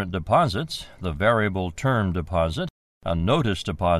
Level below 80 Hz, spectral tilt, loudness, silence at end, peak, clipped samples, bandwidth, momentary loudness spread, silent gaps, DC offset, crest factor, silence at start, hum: -40 dBFS; -6.5 dB/octave; -24 LUFS; 0 s; -6 dBFS; under 0.1%; 13.5 kHz; 11 LU; 2.70-3.01 s; under 0.1%; 16 dB; 0 s; none